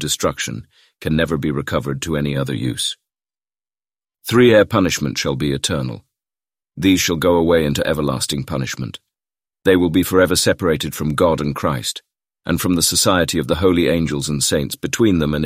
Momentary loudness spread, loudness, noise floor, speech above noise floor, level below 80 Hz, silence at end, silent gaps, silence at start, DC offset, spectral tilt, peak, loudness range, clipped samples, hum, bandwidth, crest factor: 11 LU; -17 LUFS; under -90 dBFS; over 73 dB; -40 dBFS; 0 s; none; 0 s; under 0.1%; -4.5 dB/octave; -2 dBFS; 4 LU; under 0.1%; none; 16 kHz; 16 dB